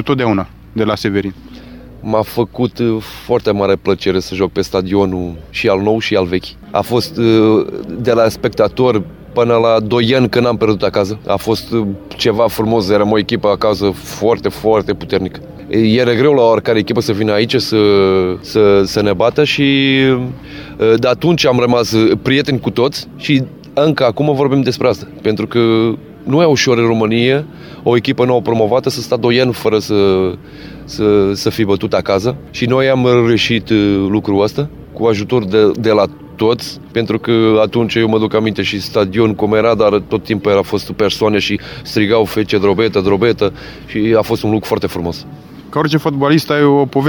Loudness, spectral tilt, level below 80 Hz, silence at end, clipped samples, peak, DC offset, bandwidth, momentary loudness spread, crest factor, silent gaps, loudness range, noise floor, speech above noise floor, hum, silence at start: -14 LUFS; -6 dB/octave; -42 dBFS; 0 s; under 0.1%; 0 dBFS; 0.1%; 19 kHz; 8 LU; 14 dB; none; 3 LU; -34 dBFS; 21 dB; none; 0 s